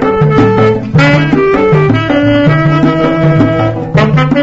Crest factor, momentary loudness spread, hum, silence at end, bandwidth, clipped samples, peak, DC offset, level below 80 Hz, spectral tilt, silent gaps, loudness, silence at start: 8 dB; 2 LU; none; 0 s; 7.6 kHz; under 0.1%; 0 dBFS; under 0.1%; -32 dBFS; -8 dB/octave; none; -9 LUFS; 0 s